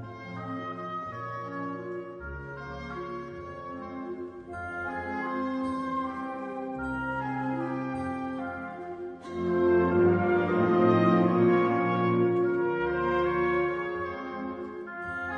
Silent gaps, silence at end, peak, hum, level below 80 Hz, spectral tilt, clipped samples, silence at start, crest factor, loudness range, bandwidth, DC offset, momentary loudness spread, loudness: none; 0 s; -12 dBFS; none; -54 dBFS; -9 dB/octave; under 0.1%; 0 s; 18 dB; 13 LU; 6.2 kHz; under 0.1%; 16 LU; -29 LUFS